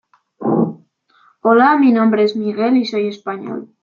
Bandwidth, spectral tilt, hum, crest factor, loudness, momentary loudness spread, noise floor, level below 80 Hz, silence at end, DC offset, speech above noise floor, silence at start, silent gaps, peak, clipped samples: 7 kHz; -7.5 dB/octave; none; 14 dB; -16 LUFS; 14 LU; -55 dBFS; -66 dBFS; 0.2 s; under 0.1%; 40 dB; 0.4 s; none; -2 dBFS; under 0.1%